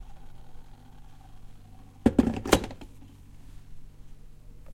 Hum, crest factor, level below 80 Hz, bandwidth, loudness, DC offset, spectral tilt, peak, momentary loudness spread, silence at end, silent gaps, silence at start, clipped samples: none; 30 dB; -44 dBFS; 16.5 kHz; -26 LUFS; under 0.1%; -5 dB/octave; -2 dBFS; 28 LU; 0 s; none; 0 s; under 0.1%